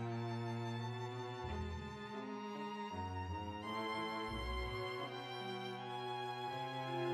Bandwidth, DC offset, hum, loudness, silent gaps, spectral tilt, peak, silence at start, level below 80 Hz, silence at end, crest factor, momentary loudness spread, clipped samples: 14 kHz; under 0.1%; none; -44 LUFS; none; -6 dB/octave; -28 dBFS; 0 s; -56 dBFS; 0 s; 14 dB; 4 LU; under 0.1%